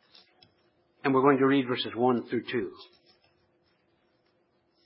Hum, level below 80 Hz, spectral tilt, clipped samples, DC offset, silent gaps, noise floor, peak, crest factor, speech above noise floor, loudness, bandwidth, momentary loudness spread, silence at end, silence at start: none; -74 dBFS; -10 dB/octave; under 0.1%; under 0.1%; none; -71 dBFS; -8 dBFS; 22 dB; 45 dB; -27 LUFS; 5.8 kHz; 11 LU; 2 s; 1.05 s